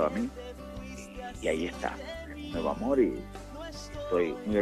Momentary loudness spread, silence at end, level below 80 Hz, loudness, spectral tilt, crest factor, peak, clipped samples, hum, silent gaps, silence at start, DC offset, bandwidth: 15 LU; 0 s; -48 dBFS; -33 LUFS; -6 dB/octave; 18 dB; -14 dBFS; under 0.1%; none; none; 0 s; under 0.1%; 14.5 kHz